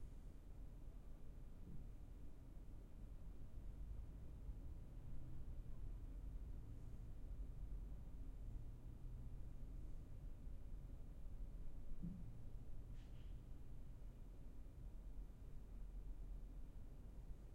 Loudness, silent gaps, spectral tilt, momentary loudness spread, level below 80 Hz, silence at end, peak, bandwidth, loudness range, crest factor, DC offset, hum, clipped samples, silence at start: -59 LUFS; none; -8 dB/octave; 5 LU; -54 dBFS; 0 s; -38 dBFS; 9.4 kHz; 3 LU; 14 dB; under 0.1%; none; under 0.1%; 0 s